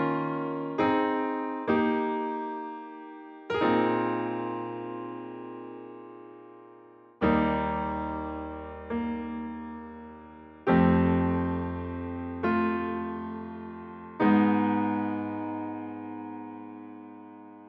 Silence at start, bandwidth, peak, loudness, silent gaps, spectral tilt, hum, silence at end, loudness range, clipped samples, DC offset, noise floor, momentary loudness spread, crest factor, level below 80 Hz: 0 s; 5.8 kHz; -12 dBFS; -29 LUFS; none; -9.5 dB/octave; none; 0 s; 5 LU; under 0.1%; under 0.1%; -53 dBFS; 20 LU; 18 dB; -52 dBFS